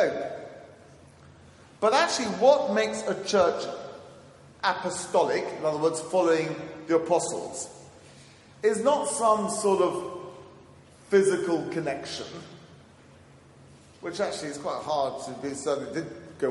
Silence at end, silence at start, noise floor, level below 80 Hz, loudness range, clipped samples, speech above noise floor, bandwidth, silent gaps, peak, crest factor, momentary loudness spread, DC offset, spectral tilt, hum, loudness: 0 s; 0 s; -53 dBFS; -70 dBFS; 8 LU; under 0.1%; 27 dB; 11.5 kHz; none; -8 dBFS; 20 dB; 17 LU; under 0.1%; -4 dB/octave; none; -27 LUFS